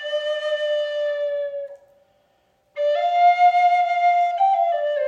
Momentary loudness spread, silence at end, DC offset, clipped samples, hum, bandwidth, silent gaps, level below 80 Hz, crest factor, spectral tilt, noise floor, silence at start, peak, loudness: 12 LU; 0 s; under 0.1%; under 0.1%; none; 7.4 kHz; none; -76 dBFS; 12 dB; 0.5 dB/octave; -64 dBFS; 0 s; -8 dBFS; -20 LUFS